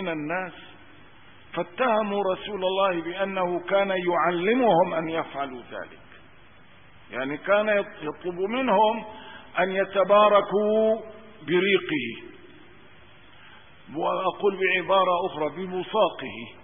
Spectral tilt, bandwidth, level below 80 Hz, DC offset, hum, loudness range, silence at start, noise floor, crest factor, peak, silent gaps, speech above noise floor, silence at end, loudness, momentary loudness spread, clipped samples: -9.5 dB/octave; 3.7 kHz; -64 dBFS; 0.3%; none; 6 LU; 0 s; -53 dBFS; 18 dB; -8 dBFS; none; 29 dB; 0.1 s; -24 LUFS; 15 LU; under 0.1%